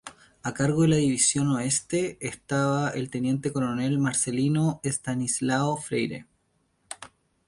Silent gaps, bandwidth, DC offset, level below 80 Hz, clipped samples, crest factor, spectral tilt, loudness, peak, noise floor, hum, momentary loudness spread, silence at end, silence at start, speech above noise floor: none; 11.5 kHz; under 0.1%; -60 dBFS; under 0.1%; 18 dB; -4.5 dB/octave; -26 LUFS; -8 dBFS; -70 dBFS; none; 14 LU; 0.4 s; 0.05 s; 45 dB